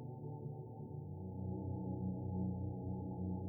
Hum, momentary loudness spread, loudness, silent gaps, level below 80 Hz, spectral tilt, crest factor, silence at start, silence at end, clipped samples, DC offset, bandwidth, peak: none; 7 LU; -44 LUFS; none; -64 dBFS; -14 dB/octave; 12 dB; 0 s; 0 s; under 0.1%; under 0.1%; 1 kHz; -30 dBFS